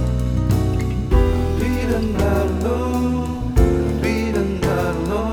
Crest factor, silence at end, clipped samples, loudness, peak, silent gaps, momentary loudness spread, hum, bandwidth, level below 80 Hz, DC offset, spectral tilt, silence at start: 16 dB; 0 s; under 0.1%; -20 LUFS; -2 dBFS; none; 3 LU; none; 18.5 kHz; -24 dBFS; under 0.1%; -7.5 dB/octave; 0 s